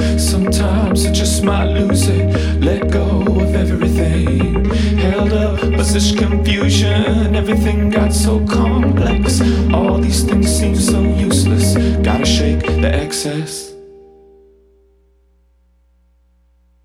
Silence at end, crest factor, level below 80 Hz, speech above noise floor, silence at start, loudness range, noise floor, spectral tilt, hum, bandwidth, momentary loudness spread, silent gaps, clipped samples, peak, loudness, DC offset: 2.95 s; 14 dB; -20 dBFS; 41 dB; 0 s; 5 LU; -54 dBFS; -5.5 dB/octave; 60 Hz at -40 dBFS; 15 kHz; 2 LU; none; under 0.1%; 0 dBFS; -14 LUFS; under 0.1%